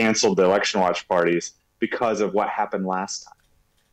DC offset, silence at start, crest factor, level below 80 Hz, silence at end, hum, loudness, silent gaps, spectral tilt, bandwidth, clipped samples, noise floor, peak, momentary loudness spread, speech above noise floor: under 0.1%; 0 s; 14 dB; -62 dBFS; 0.7 s; none; -22 LUFS; none; -4 dB/octave; 11 kHz; under 0.1%; -63 dBFS; -8 dBFS; 11 LU; 41 dB